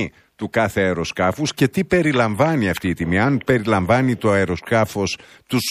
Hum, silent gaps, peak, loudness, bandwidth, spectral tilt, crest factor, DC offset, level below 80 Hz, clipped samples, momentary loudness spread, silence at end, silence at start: none; none; -2 dBFS; -19 LUFS; 15.5 kHz; -5.5 dB/octave; 18 dB; under 0.1%; -46 dBFS; under 0.1%; 7 LU; 0 s; 0 s